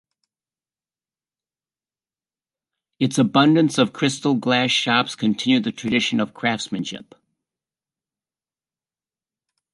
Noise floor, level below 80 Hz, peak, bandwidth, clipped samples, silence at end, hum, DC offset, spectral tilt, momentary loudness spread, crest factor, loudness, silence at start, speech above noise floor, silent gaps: under -90 dBFS; -66 dBFS; -4 dBFS; 11.5 kHz; under 0.1%; 2.75 s; none; under 0.1%; -4.5 dB/octave; 9 LU; 20 dB; -20 LUFS; 3 s; over 70 dB; none